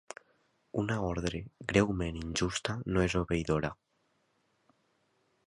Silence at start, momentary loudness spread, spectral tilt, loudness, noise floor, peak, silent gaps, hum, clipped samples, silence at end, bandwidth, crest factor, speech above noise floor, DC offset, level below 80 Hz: 0.75 s; 11 LU; -5.5 dB/octave; -33 LUFS; -75 dBFS; -10 dBFS; none; none; under 0.1%; 1.75 s; 11.5 kHz; 24 dB; 43 dB; under 0.1%; -48 dBFS